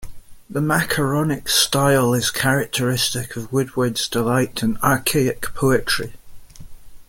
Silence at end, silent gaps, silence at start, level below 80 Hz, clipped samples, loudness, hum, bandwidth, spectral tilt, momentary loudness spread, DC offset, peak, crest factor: 0.05 s; none; 0 s; -44 dBFS; under 0.1%; -19 LUFS; none; 17 kHz; -4 dB/octave; 7 LU; under 0.1%; -2 dBFS; 18 dB